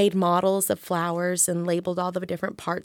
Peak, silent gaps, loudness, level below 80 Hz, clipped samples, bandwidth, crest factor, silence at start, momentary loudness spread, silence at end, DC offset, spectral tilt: -8 dBFS; none; -24 LUFS; -66 dBFS; under 0.1%; 18 kHz; 16 dB; 0 s; 8 LU; 0.05 s; under 0.1%; -4.5 dB/octave